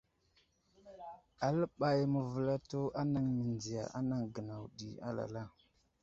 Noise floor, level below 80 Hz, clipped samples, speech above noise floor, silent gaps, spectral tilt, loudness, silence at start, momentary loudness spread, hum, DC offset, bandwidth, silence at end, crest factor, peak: -74 dBFS; -68 dBFS; under 0.1%; 38 dB; none; -7.5 dB/octave; -37 LUFS; 0.85 s; 16 LU; none; under 0.1%; 7.8 kHz; 0.55 s; 18 dB; -20 dBFS